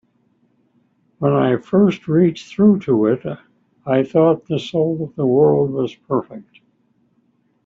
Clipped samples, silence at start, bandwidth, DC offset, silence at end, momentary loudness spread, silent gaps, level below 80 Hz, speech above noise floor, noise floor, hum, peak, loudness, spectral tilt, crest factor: under 0.1%; 1.2 s; 7.4 kHz; under 0.1%; 1.25 s; 9 LU; none; -60 dBFS; 45 dB; -62 dBFS; none; -4 dBFS; -17 LUFS; -8.5 dB/octave; 14 dB